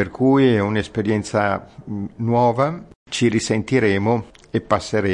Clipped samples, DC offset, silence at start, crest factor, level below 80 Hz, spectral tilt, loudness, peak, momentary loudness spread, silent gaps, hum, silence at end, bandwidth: under 0.1%; under 0.1%; 0 s; 16 dB; -52 dBFS; -6 dB/octave; -20 LUFS; -2 dBFS; 12 LU; 2.95-3.06 s; none; 0 s; 11 kHz